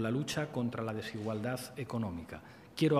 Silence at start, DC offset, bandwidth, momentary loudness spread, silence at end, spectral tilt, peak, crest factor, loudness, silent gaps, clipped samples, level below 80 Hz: 0 s; under 0.1%; 15.5 kHz; 12 LU; 0 s; -6 dB/octave; -16 dBFS; 20 dB; -37 LUFS; none; under 0.1%; -64 dBFS